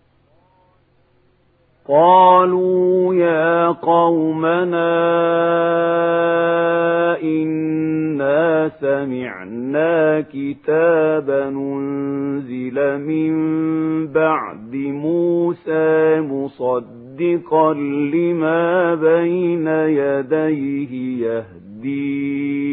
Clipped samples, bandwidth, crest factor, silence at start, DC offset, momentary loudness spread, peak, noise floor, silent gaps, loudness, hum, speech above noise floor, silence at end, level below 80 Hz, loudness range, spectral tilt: under 0.1%; 4 kHz; 16 dB; 1.9 s; under 0.1%; 9 LU; -2 dBFS; -58 dBFS; none; -17 LUFS; none; 41 dB; 0 s; -64 dBFS; 5 LU; -12 dB/octave